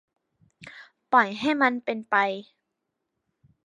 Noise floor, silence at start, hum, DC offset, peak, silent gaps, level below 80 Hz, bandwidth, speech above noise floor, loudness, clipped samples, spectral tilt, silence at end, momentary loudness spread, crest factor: -81 dBFS; 0.6 s; none; under 0.1%; -6 dBFS; none; -74 dBFS; 10.5 kHz; 57 dB; -24 LUFS; under 0.1%; -5 dB/octave; 1.25 s; 23 LU; 22 dB